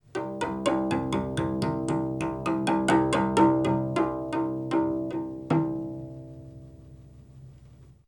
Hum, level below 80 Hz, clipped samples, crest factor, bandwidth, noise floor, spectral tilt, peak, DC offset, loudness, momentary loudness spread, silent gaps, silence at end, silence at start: none; -52 dBFS; under 0.1%; 18 dB; 11 kHz; -52 dBFS; -6.5 dB/octave; -10 dBFS; under 0.1%; -27 LUFS; 16 LU; none; 0.15 s; 0.15 s